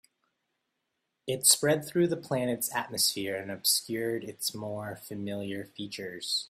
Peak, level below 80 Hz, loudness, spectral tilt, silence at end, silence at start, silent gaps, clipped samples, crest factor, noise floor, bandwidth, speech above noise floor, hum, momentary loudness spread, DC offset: -6 dBFS; -72 dBFS; -29 LUFS; -2.5 dB/octave; 0.05 s; 1.25 s; none; under 0.1%; 26 dB; -82 dBFS; 16 kHz; 51 dB; none; 15 LU; under 0.1%